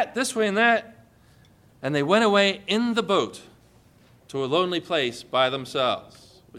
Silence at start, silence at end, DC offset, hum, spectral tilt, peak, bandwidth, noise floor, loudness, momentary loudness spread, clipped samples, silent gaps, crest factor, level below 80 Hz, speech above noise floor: 0 s; 0 s; under 0.1%; none; -4 dB/octave; -6 dBFS; 15 kHz; -56 dBFS; -23 LUFS; 10 LU; under 0.1%; none; 18 dB; -66 dBFS; 32 dB